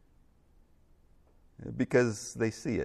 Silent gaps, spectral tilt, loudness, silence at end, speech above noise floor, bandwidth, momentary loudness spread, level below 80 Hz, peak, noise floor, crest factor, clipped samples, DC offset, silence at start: none; -6 dB/octave; -31 LUFS; 0 s; 33 dB; 13 kHz; 15 LU; -62 dBFS; -12 dBFS; -63 dBFS; 22 dB; under 0.1%; under 0.1%; 1.6 s